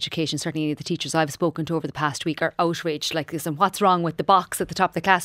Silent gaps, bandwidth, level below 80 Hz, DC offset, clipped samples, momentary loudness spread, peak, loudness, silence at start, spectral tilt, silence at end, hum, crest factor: none; 16 kHz; -58 dBFS; under 0.1%; under 0.1%; 8 LU; -2 dBFS; -23 LUFS; 0 s; -4.5 dB/octave; 0 s; none; 22 dB